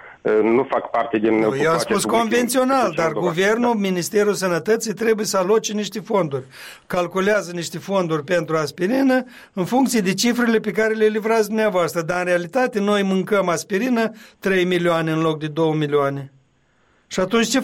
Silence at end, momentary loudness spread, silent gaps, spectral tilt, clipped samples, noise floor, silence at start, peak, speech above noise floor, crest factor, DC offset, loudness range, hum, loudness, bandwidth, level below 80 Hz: 0 s; 6 LU; none; -4.5 dB/octave; under 0.1%; -61 dBFS; 0.05 s; -6 dBFS; 42 dB; 14 dB; under 0.1%; 3 LU; none; -20 LUFS; 16.5 kHz; -60 dBFS